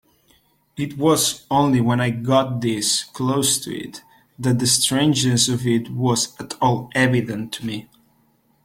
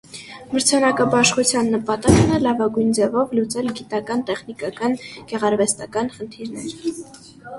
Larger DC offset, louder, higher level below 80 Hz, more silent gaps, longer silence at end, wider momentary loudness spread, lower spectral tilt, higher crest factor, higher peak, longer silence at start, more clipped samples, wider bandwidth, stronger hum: neither; about the same, -19 LUFS vs -20 LUFS; second, -56 dBFS vs -42 dBFS; neither; first, 0.85 s vs 0 s; second, 12 LU vs 15 LU; about the same, -4 dB/octave vs -4 dB/octave; about the same, 18 dB vs 20 dB; about the same, -2 dBFS vs 0 dBFS; first, 0.75 s vs 0.1 s; neither; first, 16.5 kHz vs 11.5 kHz; neither